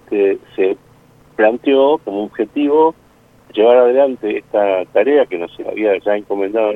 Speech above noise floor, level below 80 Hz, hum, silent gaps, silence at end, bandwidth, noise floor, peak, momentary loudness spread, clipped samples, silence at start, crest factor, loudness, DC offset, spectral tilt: 33 dB; -58 dBFS; none; none; 0 s; 4 kHz; -47 dBFS; 0 dBFS; 10 LU; under 0.1%; 0.1 s; 16 dB; -15 LUFS; under 0.1%; -7 dB/octave